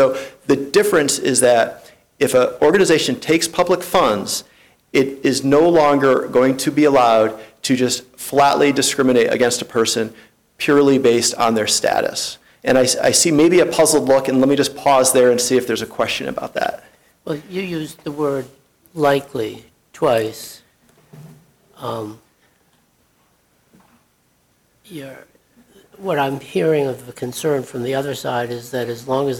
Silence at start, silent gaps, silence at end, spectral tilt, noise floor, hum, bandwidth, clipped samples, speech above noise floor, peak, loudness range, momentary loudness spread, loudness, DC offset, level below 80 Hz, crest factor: 0 s; none; 0 s; -3.5 dB/octave; -61 dBFS; none; 19 kHz; under 0.1%; 44 dB; -4 dBFS; 11 LU; 14 LU; -17 LUFS; under 0.1%; -54 dBFS; 14 dB